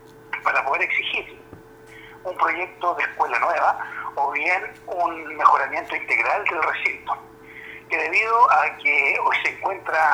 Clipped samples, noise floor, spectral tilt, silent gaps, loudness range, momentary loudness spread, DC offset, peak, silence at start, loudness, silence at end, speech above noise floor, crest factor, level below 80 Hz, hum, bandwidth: under 0.1%; -45 dBFS; -3 dB/octave; none; 4 LU; 14 LU; under 0.1%; -2 dBFS; 0.15 s; -21 LUFS; 0 s; 23 dB; 20 dB; -62 dBFS; none; over 20 kHz